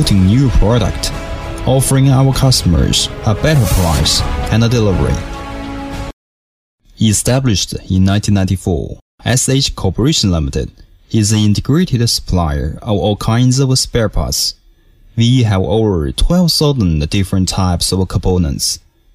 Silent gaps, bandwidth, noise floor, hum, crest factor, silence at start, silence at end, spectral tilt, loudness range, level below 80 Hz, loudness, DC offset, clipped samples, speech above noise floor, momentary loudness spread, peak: 6.13-6.78 s, 9.02-9.18 s; 16 kHz; -45 dBFS; none; 12 dB; 0 s; 0.35 s; -5 dB/octave; 4 LU; -24 dBFS; -13 LUFS; under 0.1%; under 0.1%; 33 dB; 10 LU; -2 dBFS